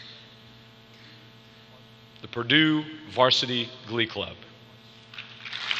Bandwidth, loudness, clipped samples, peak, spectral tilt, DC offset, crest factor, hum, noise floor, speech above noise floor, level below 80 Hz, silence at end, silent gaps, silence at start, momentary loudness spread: 8.2 kHz; -25 LUFS; under 0.1%; -4 dBFS; -4.5 dB/octave; under 0.1%; 24 dB; 60 Hz at -55 dBFS; -51 dBFS; 26 dB; -68 dBFS; 0 s; none; 0 s; 24 LU